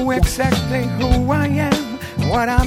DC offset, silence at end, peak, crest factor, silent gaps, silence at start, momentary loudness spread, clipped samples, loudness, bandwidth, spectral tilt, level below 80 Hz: under 0.1%; 0 s; 0 dBFS; 16 dB; none; 0 s; 4 LU; under 0.1%; -18 LUFS; 17 kHz; -6 dB/octave; -24 dBFS